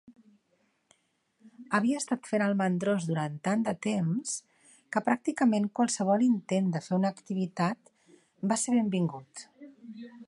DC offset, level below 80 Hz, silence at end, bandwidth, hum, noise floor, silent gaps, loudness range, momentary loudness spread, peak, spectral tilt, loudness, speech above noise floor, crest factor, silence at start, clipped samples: under 0.1%; -76 dBFS; 0.05 s; 11.5 kHz; none; -73 dBFS; none; 3 LU; 16 LU; -12 dBFS; -5.5 dB/octave; -29 LUFS; 45 dB; 18 dB; 0.1 s; under 0.1%